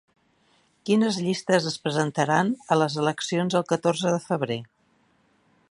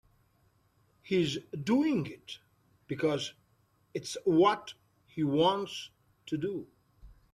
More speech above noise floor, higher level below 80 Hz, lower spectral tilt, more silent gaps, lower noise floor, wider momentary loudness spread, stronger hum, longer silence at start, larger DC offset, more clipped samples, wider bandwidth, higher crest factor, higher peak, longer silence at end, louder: about the same, 41 dB vs 40 dB; about the same, -70 dBFS vs -66 dBFS; about the same, -5 dB/octave vs -5.5 dB/octave; neither; second, -65 dBFS vs -70 dBFS; second, 5 LU vs 19 LU; neither; second, 0.85 s vs 1.05 s; neither; neither; second, 11.5 kHz vs 13.5 kHz; about the same, 20 dB vs 18 dB; first, -6 dBFS vs -14 dBFS; first, 1.05 s vs 0.2 s; first, -24 LUFS vs -31 LUFS